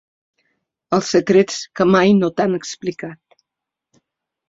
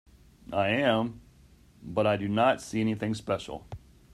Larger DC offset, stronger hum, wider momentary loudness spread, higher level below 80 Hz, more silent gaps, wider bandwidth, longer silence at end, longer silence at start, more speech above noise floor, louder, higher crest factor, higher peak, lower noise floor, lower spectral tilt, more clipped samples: neither; neither; second, 13 LU vs 17 LU; about the same, -58 dBFS vs -58 dBFS; neither; second, 7.8 kHz vs 13 kHz; first, 1.35 s vs 0.35 s; first, 0.9 s vs 0.5 s; first, 68 dB vs 29 dB; first, -17 LUFS vs -28 LUFS; about the same, 18 dB vs 18 dB; first, -2 dBFS vs -12 dBFS; first, -84 dBFS vs -57 dBFS; about the same, -5.5 dB/octave vs -6 dB/octave; neither